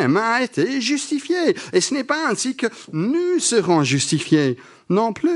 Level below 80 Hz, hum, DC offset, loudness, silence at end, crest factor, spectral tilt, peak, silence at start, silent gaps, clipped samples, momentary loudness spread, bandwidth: -70 dBFS; none; under 0.1%; -20 LUFS; 0 s; 16 dB; -4 dB/octave; -4 dBFS; 0 s; none; under 0.1%; 6 LU; 11.5 kHz